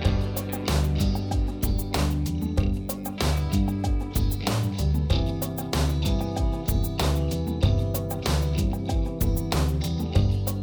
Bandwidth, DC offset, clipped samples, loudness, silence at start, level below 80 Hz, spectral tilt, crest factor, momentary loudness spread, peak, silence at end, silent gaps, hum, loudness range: over 20 kHz; under 0.1%; under 0.1%; -26 LUFS; 0 s; -28 dBFS; -6 dB/octave; 16 dB; 4 LU; -8 dBFS; 0 s; none; none; 1 LU